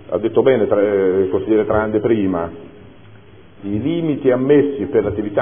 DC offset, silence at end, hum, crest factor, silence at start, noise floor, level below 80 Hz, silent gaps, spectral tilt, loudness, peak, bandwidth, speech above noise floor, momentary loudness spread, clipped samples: 0.5%; 0 s; none; 16 dB; 0.05 s; -43 dBFS; -46 dBFS; none; -12 dB/octave; -17 LUFS; 0 dBFS; 3.6 kHz; 27 dB; 9 LU; under 0.1%